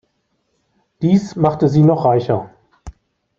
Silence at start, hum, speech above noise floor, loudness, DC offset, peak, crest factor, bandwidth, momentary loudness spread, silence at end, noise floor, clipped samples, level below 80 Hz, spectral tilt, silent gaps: 1 s; none; 53 dB; -15 LUFS; under 0.1%; -2 dBFS; 16 dB; 7.4 kHz; 9 LU; 0.5 s; -67 dBFS; under 0.1%; -48 dBFS; -9 dB/octave; none